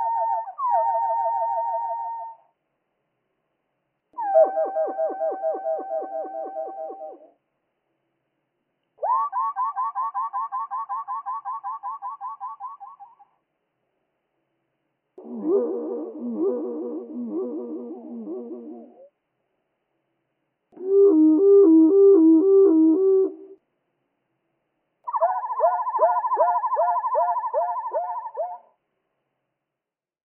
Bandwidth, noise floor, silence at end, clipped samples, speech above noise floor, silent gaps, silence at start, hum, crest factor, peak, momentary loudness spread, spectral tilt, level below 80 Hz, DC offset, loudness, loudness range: 2.1 kHz; -88 dBFS; 1.7 s; under 0.1%; 55 dB; none; 0 s; none; 16 dB; -8 dBFS; 20 LU; -1 dB/octave; under -90 dBFS; under 0.1%; -22 LUFS; 18 LU